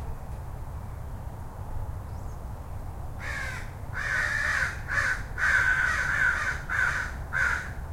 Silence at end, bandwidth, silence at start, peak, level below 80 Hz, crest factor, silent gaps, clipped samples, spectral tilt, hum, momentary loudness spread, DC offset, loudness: 0 s; 16.5 kHz; 0 s; -12 dBFS; -38 dBFS; 18 dB; none; under 0.1%; -3.5 dB/octave; none; 16 LU; under 0.1%; -27 LUFS